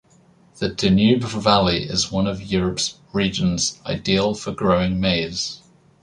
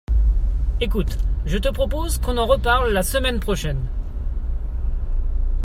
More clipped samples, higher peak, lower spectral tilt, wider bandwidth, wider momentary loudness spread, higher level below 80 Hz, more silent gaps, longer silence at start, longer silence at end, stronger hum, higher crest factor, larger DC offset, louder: neither; about the same, -2 dBFS vs -4 dBFS; about the same, -4.5 dB/octave vs -5 dB/octave; second, 11 kHz vs 16 kHz; about the same, 9 LU vs 10 LU; second, -42 dBFS vs -22 dBFS; neither; first, 0.55 s vs 0.1 s; first, 0.45 s vs 0 s; neither; about the same, 20 dB vs 16 dB; neither; first, -20 LUFS vs -23 LUFS